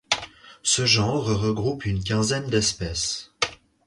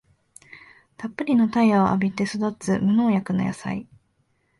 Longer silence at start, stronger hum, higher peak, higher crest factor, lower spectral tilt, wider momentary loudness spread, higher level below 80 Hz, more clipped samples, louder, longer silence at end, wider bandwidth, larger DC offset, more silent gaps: second, 0.1 s vs 0.55 s; neither; about the same, -6 dBFS vs -8 dBFS; about the same, 20 dB vs 16 dB; second, -3.5 dB/octave vs -7 dB/octave; second, 9 LU vs 13 LU; first, -44 dBFS vs -56 dBFS; neither; about the same, -23 LUFS vs -22 LUFS; second, 0.3 s vs 0.75 s; about the same, 11.5 kHz vs 11.5 kHz; neither; neither